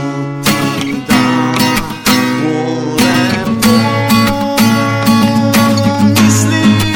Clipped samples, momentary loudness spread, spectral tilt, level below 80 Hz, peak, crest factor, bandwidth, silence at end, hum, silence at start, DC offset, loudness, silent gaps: under 0.1%; 5 LU; -4.5 dB/octave; -36 dBFS; 0 dBFS; 10 dB; 17.5 kHz; 0 s; none; 0 s; under 0.1%; -11 LUFS; none